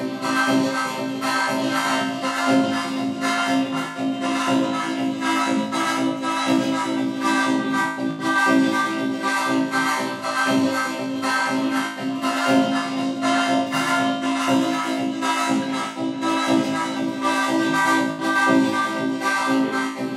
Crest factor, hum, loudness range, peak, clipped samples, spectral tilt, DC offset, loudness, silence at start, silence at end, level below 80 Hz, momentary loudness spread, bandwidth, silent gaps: 18 dB; none; 2 LU; -4 dBFS; under 0.1%; -3.5 dB/octave; under 0.1%; -21 LUFS; 0 s; 0 s; -72 dBFS; 5 LU; 14 kHz; none